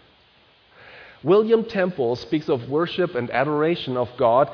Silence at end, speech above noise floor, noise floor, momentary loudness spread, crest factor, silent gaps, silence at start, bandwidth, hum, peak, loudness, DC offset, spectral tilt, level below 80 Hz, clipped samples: 0 s; 36 dB; -56 dBFS; 7 LU; 16 dB; none; 0.85 s; 5.4 kHz; none; -6 dBFS; -22 LUFS; under 0.1%; -8 dB/octave; -60 dBFS; under 0.1%